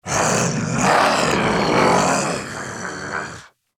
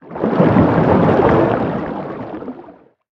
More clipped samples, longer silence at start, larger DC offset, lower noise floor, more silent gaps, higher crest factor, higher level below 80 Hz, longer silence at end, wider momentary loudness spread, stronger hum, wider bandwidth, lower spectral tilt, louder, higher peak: neither; about the same, 0.05 s vs 0.05 s; neither; about the same, -39 dBFS vs -42 dBFS; neither; about the same, 18 dB vs 16 dB; second, -46 dBFS vs -40 dBFS; about the same, 0.3 s vs 0.4 s; second, 13 LU vs 16 LU; neither; first, over 20 kHz vs 6.4 kHz; second, -3.5 dB/octave vs -10 dB/octave; second, -19 LUFS vs -14 LUFS; about the same, -2 dBFS vs 0 dBFS